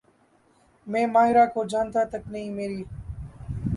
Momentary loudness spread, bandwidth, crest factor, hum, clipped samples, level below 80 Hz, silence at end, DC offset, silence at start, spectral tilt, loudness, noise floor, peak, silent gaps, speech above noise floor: 19 LU; 11.5 kHz; 18 dB; none; under 0.1%; -46 dBFS; 0 s; under 0.1%; 0.85 s; -7 dB/octave; -24 LUFS; -62 dBFS; -8 dBFS; none; 38 dB